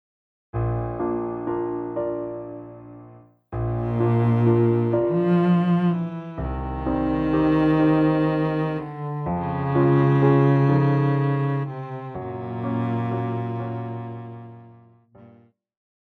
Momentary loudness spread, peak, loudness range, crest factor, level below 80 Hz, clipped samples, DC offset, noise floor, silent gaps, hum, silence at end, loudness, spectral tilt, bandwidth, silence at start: 15 LU; -6 dBFS; 9 LU; 16 dB; -42 dBFS; under 0.1%; under 0.1%; -54 dBFS; none; none; 0.75 s; -23 LUFS; -10.5 dB/octave; 4.6 kHz; 0.55 s